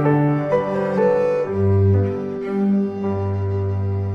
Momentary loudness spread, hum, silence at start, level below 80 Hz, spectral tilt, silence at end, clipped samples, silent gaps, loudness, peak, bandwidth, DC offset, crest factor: 6 LU; none; 0 s; -52 dBFS; -10.5 dB/octave; 0 s; under 0.1%; none; -20 LUFS; -6 dBFS; 5.6 kHz; under 0.1%; 12 dB